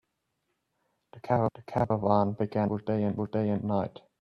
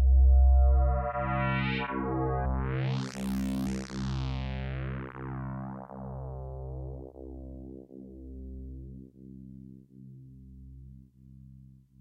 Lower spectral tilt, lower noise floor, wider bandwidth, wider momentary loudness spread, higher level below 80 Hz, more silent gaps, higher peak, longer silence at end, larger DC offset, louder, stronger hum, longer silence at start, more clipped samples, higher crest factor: first, -10 dB/octave vs -7.5 dB/octave; first, -80 dBFS vs -54 dBFS; second, 5.8 kHz vs 7.8 kHz; second, 5 LU vs 25 LU; second, -62 dBFS vs -30 dBFS; neither; first, -10 dBFS vs -16 dBFS; about the same, 0.3 s vs 0.4 s; neither; about the same, -29 LUFS vs -30 LUFS; neither; first, 1.15 s vs 0 s; neither; first, 20 dB vs 14 dB